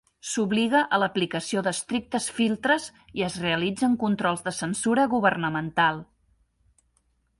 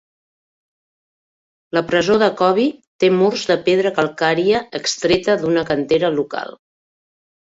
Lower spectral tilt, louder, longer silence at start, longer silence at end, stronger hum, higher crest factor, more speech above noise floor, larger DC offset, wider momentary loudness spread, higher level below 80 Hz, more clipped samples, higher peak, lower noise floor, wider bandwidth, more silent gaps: about the same, -4 dB/octave vs -4.5 dB/octave; second, -25 LUFS vs -17 LUFS; second, 0.25 s vs 1.75 s; first, 1.35 s vs 1.05 s; neither; about the same, 20 dB vs 16 dB; second, 44 dB vs over 73 dB; neither; about the same, 7 LU vs 7 LU; second, -62 dBFS vs -54 dBFS; neither; second, -6 dBFS vs -2 dBFS; second, -69 dBFS vs under -90 dBFS; first, 11.5 kHz vs 8 kHz; second, none vs 2.87-2.99 s